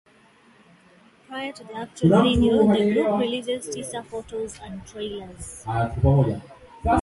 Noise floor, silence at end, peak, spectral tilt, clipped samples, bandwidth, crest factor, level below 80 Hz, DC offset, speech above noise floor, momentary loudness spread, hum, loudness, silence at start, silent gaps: -55 dBFS; 0 s; -6 dBFS; -6.5 dB/octave; under 0.1%; 11.5 kHz; 18 dB; -38 dBFS; under 0.1%; 33 dB; 18 LU; none; -23 LUFS; 1.3 s; none